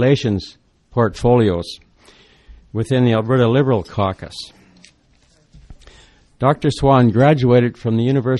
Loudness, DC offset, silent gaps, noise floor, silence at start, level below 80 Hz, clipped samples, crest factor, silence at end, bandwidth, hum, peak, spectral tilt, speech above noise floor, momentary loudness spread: -16 LUFS; under 0.1%; none; -55 dBFS; 0 s; -42 dBFS; under 0.1%; 16 dB; 0 s; 11.5 kHz; none; 0 dBFS; -7.5 dB/octave; 40 dB; 17 LU